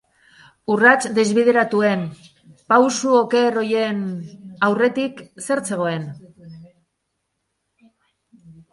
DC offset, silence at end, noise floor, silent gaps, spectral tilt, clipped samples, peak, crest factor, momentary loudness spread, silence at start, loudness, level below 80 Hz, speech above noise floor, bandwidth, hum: under 0.1%; 0.2 s; -75 dBFS; none; -4.5 dB/octave; under 0.1%; 0 dBFS; 20 dB; 16 LU; 0.7 s; -18 LUFS; -66 dBFS; 57 dB; 11.5 kHz; none